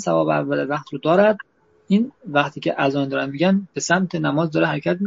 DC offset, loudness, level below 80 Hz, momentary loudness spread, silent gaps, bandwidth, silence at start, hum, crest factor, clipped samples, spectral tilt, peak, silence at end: under 0.1%; -20 LUFS; -64 dBFS; 6 LU; none; 7.8 kHz; 0 s; none; 18 dB; under 0.1%; -5.5 dB/octave; -2 dBFS; 0 s